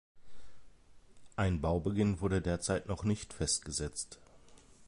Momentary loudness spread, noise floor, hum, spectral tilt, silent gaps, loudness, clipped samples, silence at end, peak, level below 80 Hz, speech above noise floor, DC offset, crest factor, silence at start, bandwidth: 10 LU; -58 dBFS; none; -5 dB/octave; none; -35 LUFS; under 0.1%; 0.1 s; -18 dBFS; -48 dBFS; 24 dB; under 0.1%; 18 dB; 0.15 s; 11.5 kHz